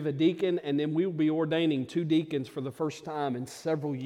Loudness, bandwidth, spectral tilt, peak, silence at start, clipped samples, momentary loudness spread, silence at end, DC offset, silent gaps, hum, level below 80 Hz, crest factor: -30 LUFS; 12.5 kHz; -7 dB/octave; -14 dBFS; 0 s; under 0.1%; 7 LU; 0 s; under 0.1%; none; none; -74 dBFS; 14 dB